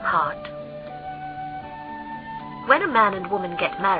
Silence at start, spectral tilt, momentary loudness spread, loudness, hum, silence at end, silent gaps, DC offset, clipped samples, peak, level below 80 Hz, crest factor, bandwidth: 0 s; -8.5 dB/octave; 16 LU; -24 LUFS; none; 0 s; none; under 0.1%; under 0.1%; -2 dBFS; -56 dBFS; 22 dB; 5.2 kHz